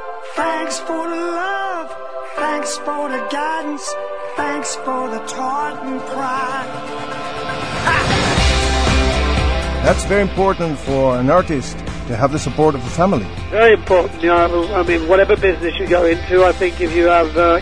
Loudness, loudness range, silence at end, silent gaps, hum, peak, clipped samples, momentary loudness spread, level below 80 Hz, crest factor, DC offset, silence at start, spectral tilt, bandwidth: -17 LUFS; 8 LU; 0 s; none; none; 0 dBFS; under 0.1%; 11 LU; -28 dBFS; 16 dB; 2%; 0 s; -5 dB/octave; 10.5 kHz